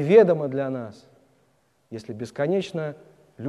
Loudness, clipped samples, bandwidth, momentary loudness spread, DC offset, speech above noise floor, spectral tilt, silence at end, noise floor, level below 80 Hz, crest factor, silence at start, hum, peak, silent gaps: -24 LUFS; under 0.1%; 10.5 kHz; 22 LU; under 0.1%; 43 dB; -7.5 dB/octave; 0 s; -66 dBFS; -70 dBFS; 20 dB; 0 s; none; -4 dBFS; none